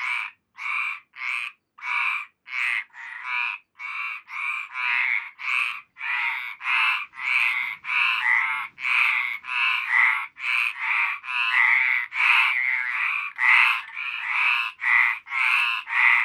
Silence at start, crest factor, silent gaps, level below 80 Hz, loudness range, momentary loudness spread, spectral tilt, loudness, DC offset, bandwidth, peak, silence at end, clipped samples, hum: 0 s; 20 dB; none; -82 dBFS; 8 LU; 12 LU; 3 dB/octave; -22 LUFS; under 0.1%; 17.5 kHz; -4 dBFS; 0 s; under 0.1%; none